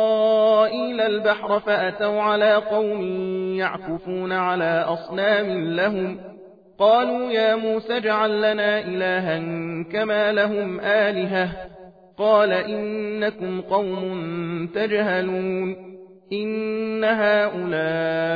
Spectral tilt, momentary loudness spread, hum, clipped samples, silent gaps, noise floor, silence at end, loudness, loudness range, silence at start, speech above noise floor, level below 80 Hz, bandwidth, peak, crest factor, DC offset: -8 dB/octave; 10 LU; none; under 0.1%; none; -45 dBFS; 0 s; -22 LUFS; 4 LU; 0 s; 23 dB; -60 dBFS; 5 kHz; -6 dBFS; 16 dB; under 0.1%